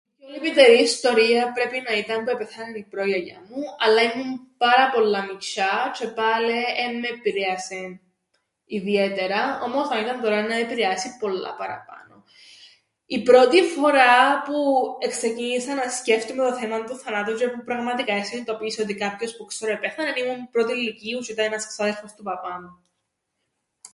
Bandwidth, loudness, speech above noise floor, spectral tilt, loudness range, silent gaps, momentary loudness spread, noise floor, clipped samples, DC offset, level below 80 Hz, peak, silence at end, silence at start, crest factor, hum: 11.5 kHz; -22 LUFS; 55 dB; -3 dB/octave; 8 LU; none; 15 LU; -77 dBFS; under 0.1%; under 0.1%; -72 dBFS; -2 dBFS; 0.05 s; 0.25 s; 22 dB; none